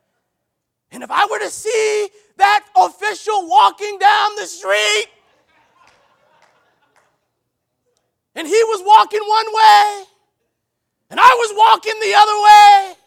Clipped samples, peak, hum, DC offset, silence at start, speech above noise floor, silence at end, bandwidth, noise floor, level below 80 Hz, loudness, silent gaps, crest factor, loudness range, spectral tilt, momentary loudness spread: 0.2%; 0 dBFS; none; under 0.1%; 0.95 s; 62 dB; 0.15 s; 16 kHz; -75 dBFS; -62 dBFS; -13 LUFS; none; 14 dB; 10 LU; 0.5 dB/octave; 13 LU